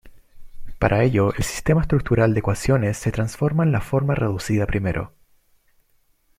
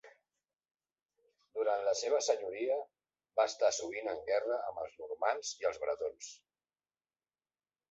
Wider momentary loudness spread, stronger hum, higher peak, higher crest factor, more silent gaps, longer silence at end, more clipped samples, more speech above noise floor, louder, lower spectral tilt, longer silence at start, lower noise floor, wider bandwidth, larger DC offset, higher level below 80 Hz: second, 6 LU vs 11 LU; neither; first, -4 dBFS vs -18 dBFS; about the same, 18 dB vs 20 dB; second, none vs 0.71-0.75 s; second, 1.3 s vs 1.55 s; neither; second, 42 dB vs over 55 dB; first, -21 LUFS vs -35 LUFS; first, -7 dB/octave vs 0 dB/octave; about the same, 0.05 s vs 0.05 s; second, -62 dBFS vs under -90 dBFS; first, 16 kHz vs 8 kHz; neither; first, -36 dBFS vs -78 dBFS